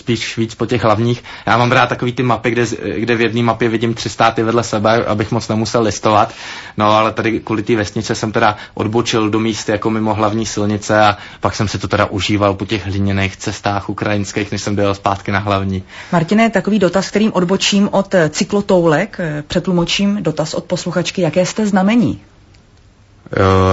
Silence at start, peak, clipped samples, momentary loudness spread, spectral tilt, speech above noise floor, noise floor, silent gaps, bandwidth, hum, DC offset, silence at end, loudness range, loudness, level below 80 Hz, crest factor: 0.05 s; 0 dBFS; under 0.1%; 7 LU; -5.5 dB/octave; 32 dB; -47 dBFS; none; 8 kHz; none; under 0.1%; 0 s; 3 LU; -15 LUFS; -44 dBFS; 16 dB